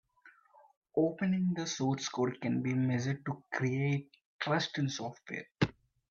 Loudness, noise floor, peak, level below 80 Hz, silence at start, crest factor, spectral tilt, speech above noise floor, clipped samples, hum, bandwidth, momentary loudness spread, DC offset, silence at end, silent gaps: -34 LUFS; -63 dBFS; -14 dBFS; -66 dBFS; 0.25 s; 20 dB; -5.5 dB/octave; 30 dB; under 0.1%; none; 7.4 kHz; 7 LU; under 0.1%; 0.4 s; 0.77-0.82 s, 4.25-4.39 s